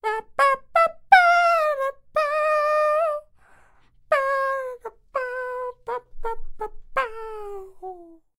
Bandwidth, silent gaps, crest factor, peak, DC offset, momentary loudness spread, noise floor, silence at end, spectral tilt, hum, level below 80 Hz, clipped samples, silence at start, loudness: 16 kHz; none; 22 dB; -2 dBFS; under 0.1%; 20 LU; -55 dBFS; 0.35 s; -2 dB/octave; none; -46 dBFS; under 0.1%; 0.05 s; -22 LUFS